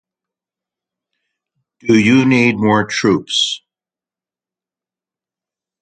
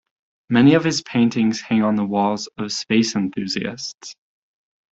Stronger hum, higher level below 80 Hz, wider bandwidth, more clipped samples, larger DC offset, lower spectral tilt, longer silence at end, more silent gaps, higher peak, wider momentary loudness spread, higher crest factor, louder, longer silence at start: neither; first, -54 dBFS vs -60 dBFS; first, 9.4 kHz vs 8 kHz; neither; neither; about the same, -4.5 dB/octave vs -5 dB/octave; first, 2.25 s vs 0.8 s; second, none vs 3.94-3.98 s; about the same, 0 dBFS vs -2 dBFS; second, 8 LU vs 14 LU; about the same, 18 dB vs 18 dB; first, -13 LUFS vs -19 LUFS; first, 1.85 s vs 0.5 s